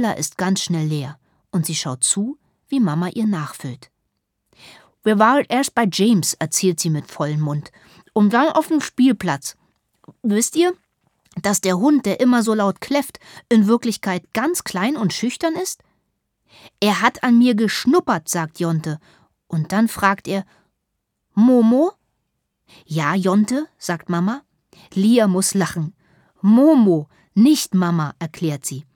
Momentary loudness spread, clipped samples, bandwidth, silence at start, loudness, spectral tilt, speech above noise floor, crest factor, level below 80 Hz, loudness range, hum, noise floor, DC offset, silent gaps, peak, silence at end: 12 LU; under 0.1%; 19 kHz; 0 s; -19 LUFS; -5 dB/octave; 57 dB; 18 dB; -64 dBFS; 4 LU; none; -75 dBFS; under 0.1%; none; -2 dBFS; 0.15 s